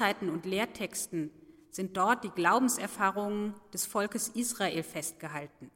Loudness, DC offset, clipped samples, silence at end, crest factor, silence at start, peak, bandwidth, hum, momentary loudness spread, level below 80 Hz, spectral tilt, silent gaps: -32 LUFS; under 0.1%; under 0.1%; 0.05 s; 20 dB; 0 s; -12 dBFS; 16.5 kHz; none; 12 LU; -70 dBFS; -3.5 dB/octave; none